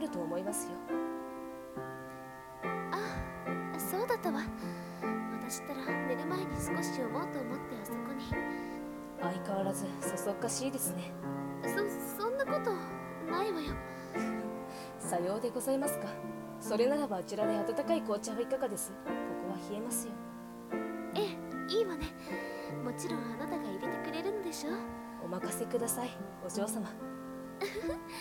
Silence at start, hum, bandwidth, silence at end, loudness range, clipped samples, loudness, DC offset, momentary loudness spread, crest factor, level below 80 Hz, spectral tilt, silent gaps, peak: 0 s; none; 17.5 kHz; 0 s; 4 LU; under 0.1%; -37 LUFS; under 0.1%; 9 LU; 18 dB; -60 dBFS; -4.5 dB/octave; none; -18 dBFS